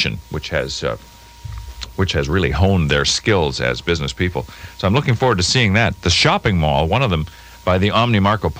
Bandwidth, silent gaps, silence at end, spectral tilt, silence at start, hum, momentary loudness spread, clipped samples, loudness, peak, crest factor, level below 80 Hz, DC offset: 16 kHz; none; 0 s; -4.5 dB/octave; 0 s; none; 16 LU; under 0.1%; -17 LUFS; -2 dBFS; 16 dB; -32 dBFS; under 0.1%